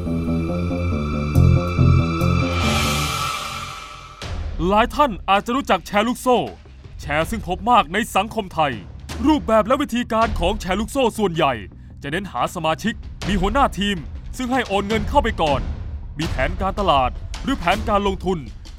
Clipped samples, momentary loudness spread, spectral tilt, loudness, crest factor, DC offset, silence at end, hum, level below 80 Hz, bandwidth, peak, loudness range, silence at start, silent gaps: under 0.1%; 13 LU; -5.5 dB/octave; -20 LUFS; 18 dB; under 0.1%; 0 s; none; -30 dBFS; 16 kHz; -2 dBFS; 3 LU; 0 s; none